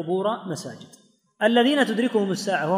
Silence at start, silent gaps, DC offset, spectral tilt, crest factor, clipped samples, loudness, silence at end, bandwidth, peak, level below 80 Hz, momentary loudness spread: 0 s; none; under 0.1%; -5 dB/octave; 18 dB; under 0.1%; -22 LUFS; 0 s; 15.5 kHz; -6 dBFS; -76 dBFS; 14 LU